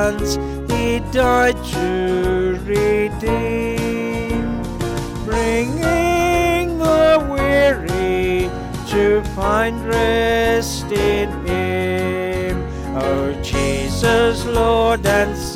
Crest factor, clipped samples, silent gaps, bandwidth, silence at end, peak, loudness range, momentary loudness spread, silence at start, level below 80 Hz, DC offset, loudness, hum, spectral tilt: 14 dB; under 0.1%; none; 16.5 kHz; 0 s; -4 dBFS; 4 LU; 7 LU; 0 s; -30 dBFS; 0.1%; -18 LUFS; none; -5.5 dB/octave